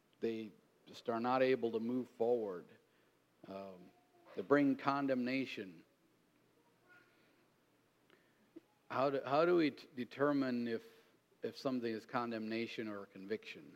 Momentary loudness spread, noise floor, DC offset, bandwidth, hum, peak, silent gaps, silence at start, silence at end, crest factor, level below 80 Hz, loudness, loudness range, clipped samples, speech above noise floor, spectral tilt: 17 LU; -74 dBFS; under 0.1%; 15 kHz; none; -18 dBFS; none; 0.2 s; 0 s; 22 dB; under -90 dBFS; -38 LUFS; 6 LU; under 0.1%; 37 dB; -7 dB/octave